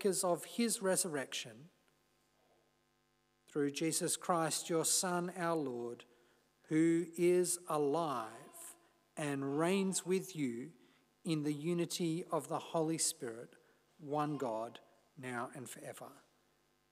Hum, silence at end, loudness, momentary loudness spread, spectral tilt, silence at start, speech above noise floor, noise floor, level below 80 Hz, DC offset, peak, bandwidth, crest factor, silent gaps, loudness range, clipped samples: 50 Hz at -70 dBFS; 0.75 s; -36 LUFS; 17 LU; -4 dB/octave; 0 s; 40 dB; -77 dBFS; under -90 dBFS; under 0.1%; -20 dBFS; 15.5 kHz; 18 dB; none; 5 LU; under 0.1%